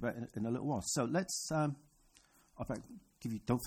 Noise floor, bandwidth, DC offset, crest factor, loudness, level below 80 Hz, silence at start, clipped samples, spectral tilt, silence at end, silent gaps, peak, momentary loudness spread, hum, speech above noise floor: -68 dBFS; 16.5 kHz; under 0.1%; 18 dB; -38 LUFS; -62 dBFS; 0 s; under 0.1%; -5 dB/octave; 0 s; none; -20 dBFS; 12 LU; none; 30 dB